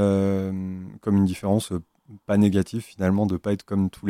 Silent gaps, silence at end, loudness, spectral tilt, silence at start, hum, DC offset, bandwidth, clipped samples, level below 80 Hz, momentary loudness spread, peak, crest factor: none; 0 s; -24 LUFS; -7.5 dB/octave; 0 s; none; under 0.1%; 14.5 kHz; under 0.1%; -54 dBFS; 11 LU; -8 dBFS; 16 dB